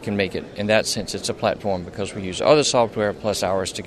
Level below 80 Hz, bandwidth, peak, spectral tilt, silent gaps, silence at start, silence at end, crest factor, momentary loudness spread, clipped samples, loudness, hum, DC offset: -50 dBFS; 13.5 kHz; -2 dBFS; -4 dB/octave; none; 0 s; 0 s; 20 dB; 11 LU; under 0.1%; -22 LUFS; none; under 0.1%